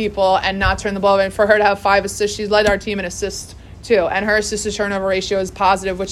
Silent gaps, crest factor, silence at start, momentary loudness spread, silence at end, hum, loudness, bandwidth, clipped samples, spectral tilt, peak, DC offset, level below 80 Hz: none; 16 dB; 0 s; 9 LU; 0 s; none; -17 LUFS; 13.5 kHz; under 0.1%; -3.5 dB/octave; 0 dBFS; under 0.1%; -36 dBFS